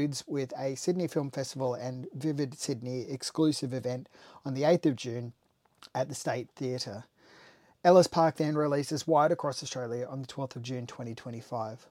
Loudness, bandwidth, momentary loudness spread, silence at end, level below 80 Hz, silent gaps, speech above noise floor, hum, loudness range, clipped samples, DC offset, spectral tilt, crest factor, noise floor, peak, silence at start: -31 LUFS; 16 kHz; 13 LU; 0.15 s; -74 dBFS; none; 28 dB; none; 6 LU; under 0.1%; under 0.1%; -5.5 dB/octave; 22 dB; -59 dBFS; -8 dBFS; 0 s